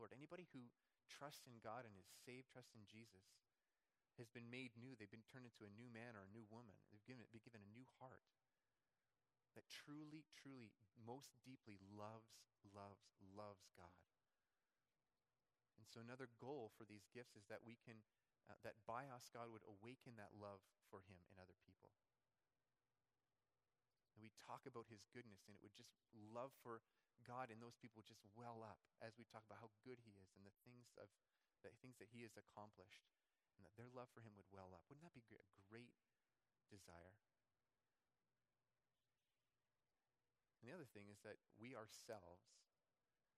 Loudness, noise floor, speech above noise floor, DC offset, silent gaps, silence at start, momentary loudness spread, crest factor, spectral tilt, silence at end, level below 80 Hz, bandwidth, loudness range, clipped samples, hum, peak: -62 LUFS; under -90 dBFS; over 28 dB; under 0.1%; none; 0 s; 10 LU; 26 dB; -5 dB/octave; 0.75 s; under -90 dBFS; 13.5 kHz; 7 LU; under 0.1%; none; -38 dBFS